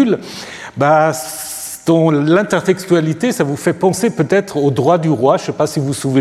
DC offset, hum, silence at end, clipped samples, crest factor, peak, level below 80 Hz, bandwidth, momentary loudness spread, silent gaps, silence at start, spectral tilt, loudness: under 0.1%; none; 0 s; under 0.1%; 14 dB; 0 dBFS; -56 dBFS; 15.5 kHz; 10 LU; none; 0 s; -6 dB/octave; -15 LUFS